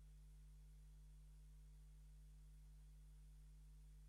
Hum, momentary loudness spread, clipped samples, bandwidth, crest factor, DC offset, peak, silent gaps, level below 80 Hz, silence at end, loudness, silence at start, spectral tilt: 50 Hz at -65 dBFS; 0 LU; under 0.1%; 12.5 kHz; 6 dB; under 0.1%; -58 dBFS; none; -62 dBFS; 0 s; -66 LUFS; 0 s; -5.5 dB/octave